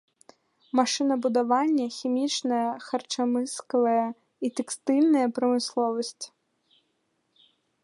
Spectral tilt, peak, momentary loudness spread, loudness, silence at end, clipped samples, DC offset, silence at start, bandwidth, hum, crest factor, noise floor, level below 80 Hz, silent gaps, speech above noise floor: -3 dB/octave; -8 dBFS; 9 LU; -26 LUFS; 1.55 s; under 0.1%; under 0.1%; 0.75 s; 11.5 kHz; none; 18 dB; -74 dBFS; -84 dBFS; none; 49 dB